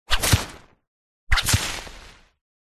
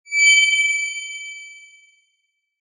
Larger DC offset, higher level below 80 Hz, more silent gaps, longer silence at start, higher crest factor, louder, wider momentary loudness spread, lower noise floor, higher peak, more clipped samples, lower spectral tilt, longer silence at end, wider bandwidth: neither; first, -32 dBFS vs under -90 dBFS; first, 0.87-1.27 s vs none; about the same, 0.1 s vs 0.1 s; about the same, 22 dB vs 18 dB; second, -22 LUFS vs -15 LUFS; second, 16 LU vs 21 LU; second, -46 dBFS vs -72 dBFS; about the same, -4 dBFS vs -4 dBFS; neither; first, -2.5 dB/octave vs 15.5 dB/octave; second, 0.6 s vs 1 s; first, 13.5 kHz vs 9.6 kHz